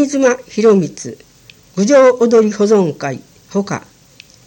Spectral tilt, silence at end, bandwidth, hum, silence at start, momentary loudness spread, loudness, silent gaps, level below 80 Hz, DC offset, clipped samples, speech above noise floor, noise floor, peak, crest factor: -5.5 dB/octave; 0.65 s; 17 kHz; none; 0 s; 17 LU; -13 LUFS; none; -58 dBFS; under 0.1%; under 0.1%; 32 dB; -45 dBFS; 0 dBFS; 14 dB